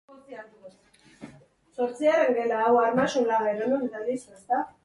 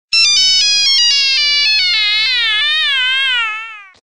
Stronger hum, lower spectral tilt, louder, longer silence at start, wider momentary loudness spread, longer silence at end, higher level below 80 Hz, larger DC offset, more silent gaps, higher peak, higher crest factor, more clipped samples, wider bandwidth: neither; first, -5 dB/octave vs 4 dB/octave; second, -25 LUFS vs -10 LUFS; about the same, 0.1 s vs 0.1 s; first, 22 LU vs 6 LU; about the same, 0.15 s vs 0.15 s; second, -70 dBFS vs -56 dBFS; second, under 0.1% vs 1%; neither; second, -10 dBFS vs 0 dBFS; about the same, 16 dB vs 12 dB; neither; second, 11.5 kHz vs 14.5 kHz